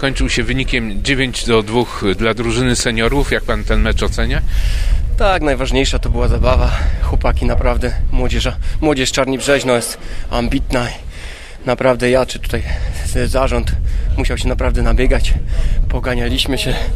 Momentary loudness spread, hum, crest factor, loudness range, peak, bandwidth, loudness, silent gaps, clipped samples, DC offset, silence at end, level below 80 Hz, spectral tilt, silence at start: 6 LU; none; 14 dB; 2 LU; 0 dBFS; 14 kHz; -17 LUFS; none; under 0.1%; under 0.1%; 0 s; -18 dBFS; -5 dB/octave; 0 s